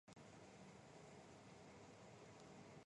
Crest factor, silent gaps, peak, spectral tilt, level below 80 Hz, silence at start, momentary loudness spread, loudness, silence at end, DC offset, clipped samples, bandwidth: 14 dB; none; -48 dBFS; -5 dB/octave; -82 dBFS; 0.05 s; 1 LU; -63 LUFS; 0.05 s; under 0.1%; under 0.1%; 11 kHz